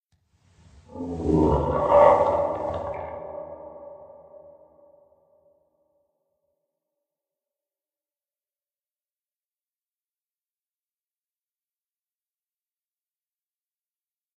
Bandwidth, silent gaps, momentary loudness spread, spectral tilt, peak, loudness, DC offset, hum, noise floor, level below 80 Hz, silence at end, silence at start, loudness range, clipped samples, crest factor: 8.6 kHz; none; 26 LU; -8.5 dB/octave; -4 dBFS; -22 LUFS; under 0.1%; none; under -90 dBFS; -46 dBFS; 10.3 s; 0.95 s; 19 LU; under 0.1%; 26 dB